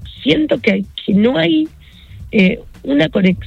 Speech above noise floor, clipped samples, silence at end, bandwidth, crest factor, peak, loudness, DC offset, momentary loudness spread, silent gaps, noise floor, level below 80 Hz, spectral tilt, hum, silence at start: 22 dB; under 0.1%; 0 s; 7.2 kHz; 14 dB; -2 dBFS; -15 LUFS; under 0.1%; 6 LU; none; -36 dBFS; -40 dBFS; -7.5 dB/octave; none; 0 s